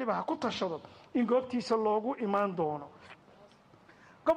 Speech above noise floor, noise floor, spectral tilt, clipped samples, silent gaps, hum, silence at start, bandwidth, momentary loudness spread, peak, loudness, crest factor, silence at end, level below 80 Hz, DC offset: 28 dB; -59 dBFS; -6 dB/octave; under 0.1%; none; none; 0 s; 10 kHz; 13 LU; -16 dBFS; -32 LUFS; 16 dB; 0 s; -72 dBFS; under 0.1%